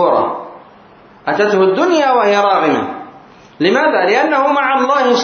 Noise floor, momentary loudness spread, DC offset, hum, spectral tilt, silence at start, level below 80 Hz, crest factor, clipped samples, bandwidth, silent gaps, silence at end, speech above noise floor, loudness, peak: -42 dBFS; 13 LU; under 0.1%; none; -4.5 dB/octave; 0 s; -62 dBFS; 14 dB; under 0.1%; 6.8 kHz; none; 0 s; 30 dB; -13 LUFS; 0 dBFS